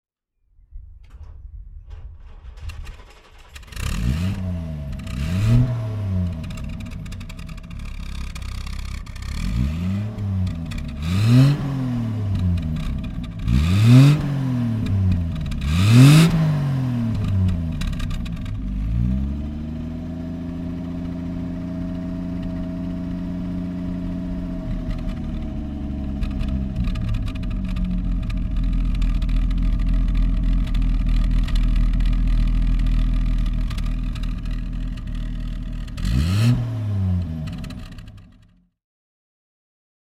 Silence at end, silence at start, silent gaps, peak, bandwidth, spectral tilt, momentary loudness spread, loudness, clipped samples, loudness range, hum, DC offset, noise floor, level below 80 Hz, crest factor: 1.9 s; 0.7 s; none; -2 dBFS; 13.5 kHz; -7 dB/octave; 15 LU; -23 LUFS; under 0.1%; 12 LU; none; under 0.1%; -65 dBFS; -26 dBFS; 20 dB